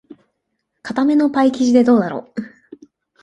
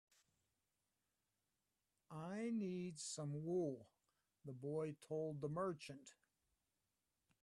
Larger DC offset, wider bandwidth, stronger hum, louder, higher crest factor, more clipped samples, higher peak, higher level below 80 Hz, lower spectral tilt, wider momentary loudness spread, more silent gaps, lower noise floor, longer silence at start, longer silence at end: neither; second, 10 kHz vs 12.5 kHz; neither; first, -16 LUFS vs -47 LUFS; about the same, 16 dB vs 16 dB; neither; first, -2 dBFS vs -32 dBFS; first, -62 dBFS vs -86 dBFS; about the same, -6 dB/octave vs -6 dB/octave; first, 18 LU vs 14 LU; neither; second, -73 dBFS vs under -90 dBFS; second, 0.1 s vs 2.1 s; second, 0.75 s vs 1.3 s